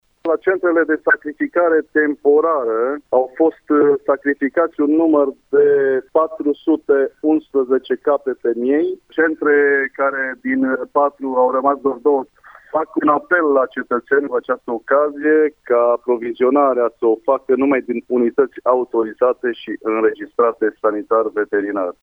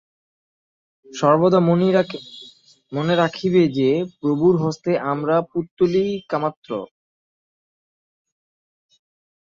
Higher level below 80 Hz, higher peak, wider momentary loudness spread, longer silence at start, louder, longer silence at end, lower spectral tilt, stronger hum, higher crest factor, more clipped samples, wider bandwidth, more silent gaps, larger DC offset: about the same, -62 dBFS vs -62 dBFS; about the same, -2 dBFS vs -2 dBFS; second, 6 LU vs 14 LU; second, 0.25 s vs 1.1 s; first, -17 LUFS vs -20 LUFS; second, 0.1 s vs 2.6 s; about the same, -8 dB/octave vs -7.5 dB/octave; neither; about the same, 16 dB vs 18 dB; neither; second, 3.7 kHz vs 7.6 kHz; second, none vs 5.71-5.77 s, 6.57-6.62 s; neither